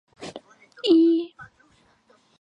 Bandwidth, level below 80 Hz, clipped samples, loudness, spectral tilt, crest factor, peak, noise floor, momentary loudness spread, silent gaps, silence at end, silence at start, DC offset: 8.6 kHz; -70 dBFS; under 0.1%; -20 LUFS; -5 dB/octave; 18 dB; -8 dBFS; -61 dBFS; 22 LU; none; 0.95 s; 0.2 s; under 0.1%